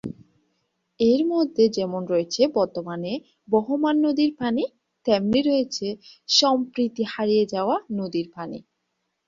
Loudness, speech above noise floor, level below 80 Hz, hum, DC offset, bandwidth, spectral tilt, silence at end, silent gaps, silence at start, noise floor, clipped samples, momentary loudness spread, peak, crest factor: -23 LUFS; 54 dB; -62 dBFS; none; under 0.1%; 7.6 kHz; -4.5 dB/octave; 0.7 s; none; 0.05 s; -77 dBFS; under 0.1%; 12 LU; -4 dBFS; 18 dB